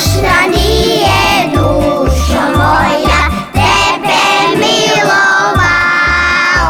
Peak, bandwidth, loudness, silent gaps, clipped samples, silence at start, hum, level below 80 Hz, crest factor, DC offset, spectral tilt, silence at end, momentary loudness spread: -2 dBFS; 19.5 kHz; -9 LUFS; none; under 0.1%; 0 s; none; -20 dBFS; 8 dB; under 0.1%; -4 dB/octave; 0 s; 3 LU